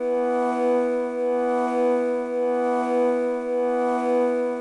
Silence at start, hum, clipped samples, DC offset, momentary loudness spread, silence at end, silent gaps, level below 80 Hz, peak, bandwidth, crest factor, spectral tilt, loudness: 0 s; none; under 0.1%; under 0.1%; 3 LU; 0 s; none; -66 dBFS; -12 dBFS; 11 kHz; 10 dB; -5 dB/octave; -23 LUFS